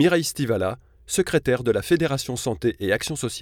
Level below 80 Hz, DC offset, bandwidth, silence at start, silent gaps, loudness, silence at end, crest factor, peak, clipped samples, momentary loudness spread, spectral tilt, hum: -48 dBFS; under 0.1%; 18.5 kHz; 0 s; none; -23 LUFS; 0 s; 16 dB; -6 dBFS; under 0.1%; 6 LU; -4.5 dB/octave; none